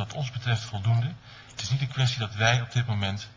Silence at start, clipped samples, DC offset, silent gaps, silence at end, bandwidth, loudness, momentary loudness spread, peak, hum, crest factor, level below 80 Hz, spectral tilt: 0 s; under 0.1%; under 0.1%; none; 0 s; 7.6 kHz; -27 LUFS; 11 LU; -8 dBFS; none; 20 dB; -52 dBFS; -4.5 dB/octave